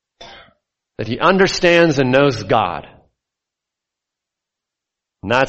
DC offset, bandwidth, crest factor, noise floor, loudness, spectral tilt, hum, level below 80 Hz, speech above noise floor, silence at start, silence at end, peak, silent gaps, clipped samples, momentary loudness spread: under 0.1%; 8.2 kHz; 18 dB; -83 dBFS; -15 LUFS; -5 dB/octave; none; -48 dBFS; 69 dB; 0.2 s; 0 s; 0 dBFS; none; under 0.1%; 16 LU